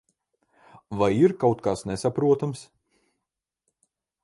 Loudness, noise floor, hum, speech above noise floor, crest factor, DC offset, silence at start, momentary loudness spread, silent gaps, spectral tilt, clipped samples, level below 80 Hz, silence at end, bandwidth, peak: -24 LUFS; -85 dBFS; none; 62 dB; 20 dB; under 0.1%; 0.9 s; 12 LU; none; -7 dB/octave; under 0.1%; -58 dBFS; 1.6 s; 11.5 kHz; -8 dBFS